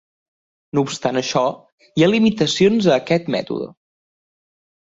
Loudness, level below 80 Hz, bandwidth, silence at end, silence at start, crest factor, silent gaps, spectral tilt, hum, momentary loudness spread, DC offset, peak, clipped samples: -18 LUFS; -58 dBFS; 8 kHz; 1.25 s; 0.75 s; 18 dB; 1.72-1.78 s; -5.5 dB/octave; none; 12 LU; under 0.1%; -2 dBFS; under 0.1%